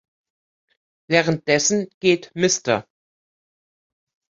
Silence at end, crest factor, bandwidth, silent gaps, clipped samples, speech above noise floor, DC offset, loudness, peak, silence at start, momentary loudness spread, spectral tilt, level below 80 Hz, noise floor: 1.55 s; 22 dB; 7.8 kHz; 1.94-2.01 s; under 0.1%; over 70 dB; under 0.1%; -20 LUFS; -2 dBFS; 1.1 s; 3 LU; -3.5 dB/octave; -62 dBFS; under -90 dBFS